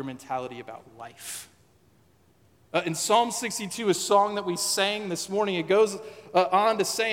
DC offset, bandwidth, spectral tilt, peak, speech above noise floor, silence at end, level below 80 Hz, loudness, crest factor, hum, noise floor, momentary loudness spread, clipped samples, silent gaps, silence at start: under 0.1%; 17 kHz; -3 dB/octave; -8 dBFS; 36 dB; 0 s; -74 dBFS; -25 LUFS; 18 dB; none; -62 dBFS; 16 LU; under 0.1%; none; 0 s